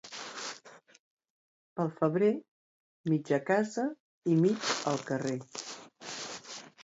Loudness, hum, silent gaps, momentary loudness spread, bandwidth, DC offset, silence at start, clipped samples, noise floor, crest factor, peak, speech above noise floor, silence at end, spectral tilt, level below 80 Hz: -32 LUFS; none; 0.99-1.17 s, 1.30-1.76 s, 2.48-3.04 s, 4.00-4.22 s; 15 LU; 8 kHz; under 0.1%; 0.05 s; under 0.1%; -53 dBFS; 18 dB; -14 dBFS; 23 dB; 0 s; -5 dB/octave; -78 dBFS